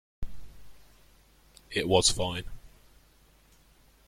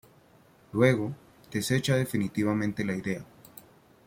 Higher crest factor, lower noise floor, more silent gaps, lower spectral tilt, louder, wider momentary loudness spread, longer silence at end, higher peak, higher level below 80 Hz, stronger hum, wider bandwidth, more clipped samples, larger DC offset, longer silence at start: about the same, 26 dB vs 22 dB; about the same, -61 dBFS vs -59 dBFS; neither; second, -3 dB/octave vs -6 dB/octave; about the same, -27 LUFS vs -28 LUFS; first, 25 LU vs 22 LU; first, 1.4 s vs 0.45 s; about the same, -8 dBFS vs -8 dBFS; first, -48 dBFS vs -62 dBFS; neither; about the same, 16.5 kHz vs 16.5 kHz; neither; neither; second, 0.2 s vs 0.75 s